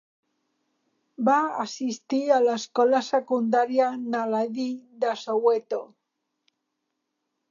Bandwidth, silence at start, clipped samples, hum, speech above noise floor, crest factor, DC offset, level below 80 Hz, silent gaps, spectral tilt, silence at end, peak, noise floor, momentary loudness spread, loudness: 7.4 kHz; 1.2 s; under 0.1%; none; 56 dB; 18 dB; under 0.1%; -84 dBFS; none; -4.5 dB/octave; 1.65 s; -8 dBFS; -80 dBFS; 9 LU; -25 LUFS